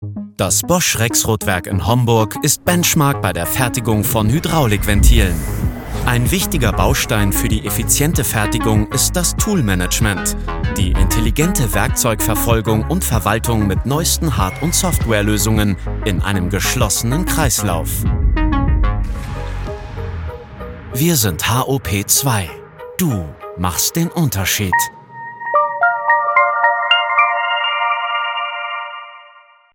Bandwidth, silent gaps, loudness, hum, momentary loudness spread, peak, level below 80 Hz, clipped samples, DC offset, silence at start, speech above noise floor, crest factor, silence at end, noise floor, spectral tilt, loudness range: 17.5 kHz; none; -16 LUFS; none; 11 LU; 0 dBFS; -24 dBFS; under 0.1%; under 0.1%; 0 s; 30 dB; 16 dB; 0.5 s; -46 dBFS; -4 dB/octave; 3 LU